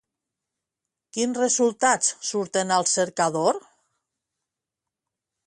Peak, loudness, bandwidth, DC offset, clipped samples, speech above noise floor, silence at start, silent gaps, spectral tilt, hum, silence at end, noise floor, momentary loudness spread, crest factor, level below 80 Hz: -6 dBFS; -23 LUFS; 11.5 kHz; under 0.1%; under 0.1%; 64 dB; 1.15 s; none; -2.5 dB/octave; none; 1.9 s; -87 dBFS; 7 LU; 20 dB; -74 dBFS